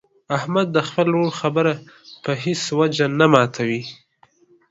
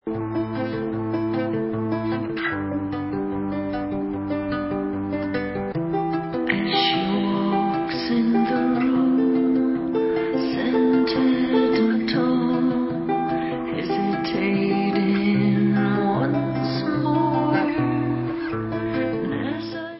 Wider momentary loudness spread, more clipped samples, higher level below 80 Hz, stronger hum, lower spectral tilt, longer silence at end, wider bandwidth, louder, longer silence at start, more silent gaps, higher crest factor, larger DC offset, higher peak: first, 12 LU vs 7 LU; neither; second, -62 dBFS vs -50 dBFS; neither; second, -5.5 dB/octave vs -11 dB/octave; first, 0.75 s vs 0 s; first, 8 kHz vs 5.8 kHz; first, -20 LUFS vs -23 LUFS; first, 0.3 s vs 0.05 s; neither; first, 20 dB vs 14 dB; neither; first, 0 dBFS vs -8 dBFS